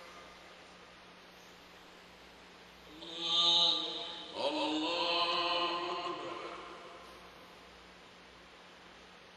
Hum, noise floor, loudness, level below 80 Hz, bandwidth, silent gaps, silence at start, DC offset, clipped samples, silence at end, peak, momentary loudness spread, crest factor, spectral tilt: none; -56 dBFS; -32 LUFS; -72 dBFS; 13 kHz; none; 0 s; under 0.1%; under 0.1%; 0 s; -16 dBFS; 26 LU; 22 dB; -2 dB/octave